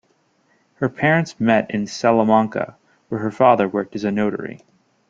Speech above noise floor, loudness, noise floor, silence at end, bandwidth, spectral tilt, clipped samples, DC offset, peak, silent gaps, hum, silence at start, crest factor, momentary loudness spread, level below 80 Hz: 44 dB; -19 LUFS; -62 dBFS; 0.55 s; 7.6 kHz; -6.5 dB/octave; under 0.1%; under 0.1%; -2 dBFS; none; none; 0.8 s; 18 dB; 13 LU; -60 dBFS